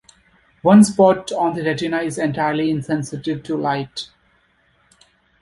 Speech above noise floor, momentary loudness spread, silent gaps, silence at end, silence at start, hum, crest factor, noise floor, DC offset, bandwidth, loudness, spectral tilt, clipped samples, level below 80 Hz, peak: 43 dB; 14 LU; none; 1.35 s; 0.65 s; none; 18 dB; -60 dBFS; under 0.1%; 11.5 kHz; -18 LUFS; -6 dB/octave; under 0.1%; -56 dBFS; -2 dBFS